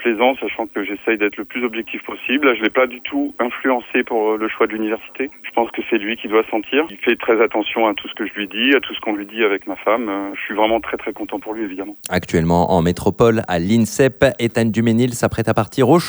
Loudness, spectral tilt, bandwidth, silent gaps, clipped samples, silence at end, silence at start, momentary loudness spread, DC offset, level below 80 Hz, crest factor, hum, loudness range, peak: -18 LUFS; -5.5 dB/octave; over 20 kHz; none; under 0.1%; 0 s; 0 s; 9 LU; under 0.1%; -46 dBFS; 18 dB; none; 4 LU; 0 dBFS